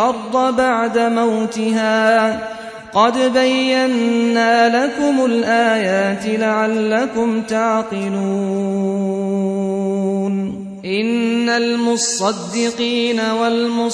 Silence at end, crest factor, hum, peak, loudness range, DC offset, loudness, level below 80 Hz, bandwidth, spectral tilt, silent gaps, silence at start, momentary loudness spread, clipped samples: 0 s; 16 dB; none; -2 dBFS; 4 LU; under 0.1%; -17 LUFS; -58 dBFS; 11 kHz; -4.5 dB/octave; none; 0 s; 6 LU; under 0.1%